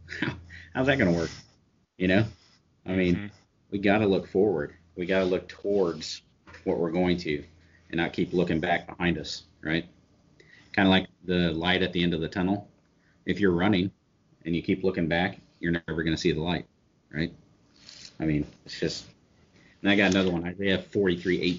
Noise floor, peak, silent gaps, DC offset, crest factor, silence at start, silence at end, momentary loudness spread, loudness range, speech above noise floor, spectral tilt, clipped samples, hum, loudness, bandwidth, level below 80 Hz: -65 dBFS; -6 dBFS; none; under 0.1%; 22 dB; 0.05 s; 0 s; 13 LU; 4 LU; 39 dB; -4.5 dB/octave; under 0.1%; none; -27 LUFS; 7.4 kHz; -52 dBFS